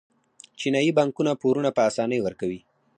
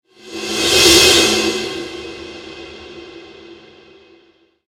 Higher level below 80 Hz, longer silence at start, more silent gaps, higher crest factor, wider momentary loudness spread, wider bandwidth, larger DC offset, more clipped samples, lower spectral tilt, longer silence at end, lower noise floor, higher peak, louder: second, -64 dBFS vs -42 dBFS; first, 0.6 s vs 0.25 s; neither; about the same, 18 dB vs 18 dB; second, 10 LU vs 26 LU; second, 10 kHz vs 16.5 kHz; neither; neither; first, -5.5 dB/octave vs -1.5 dB/octave; second, 0.4 s vs 1.15 s; about the same, -52 dBFS vs -54 dBFS; second, -8 dBFS vs 0 dBFS; second, -24 LUFS vs -11 LUFS